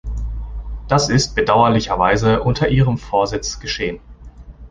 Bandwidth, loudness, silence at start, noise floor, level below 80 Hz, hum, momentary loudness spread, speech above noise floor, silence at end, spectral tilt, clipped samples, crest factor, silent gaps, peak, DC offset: 9.8 kHz; -17 LUFS; 0.05 s; -38 dBFS; -30 dBFS; none; 15 LU; 21 dB; 0 s; -5 dB/octave; under 0.1%; 16 dB; none; -2 dBFS; under 0.1%